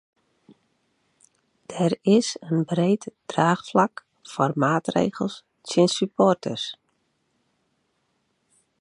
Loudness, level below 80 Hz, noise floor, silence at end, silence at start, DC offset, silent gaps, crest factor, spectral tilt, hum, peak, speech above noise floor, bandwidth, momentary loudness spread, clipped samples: -23 LUFS; -68 dBFS; -72 dBFS; 2.05 s; 1.7 s; under 0.1%; none; 20 dB; -5.5 dB/octave; none; -4 dBFS; 49 dB; 11 kHz; 11 LU; under 0.1%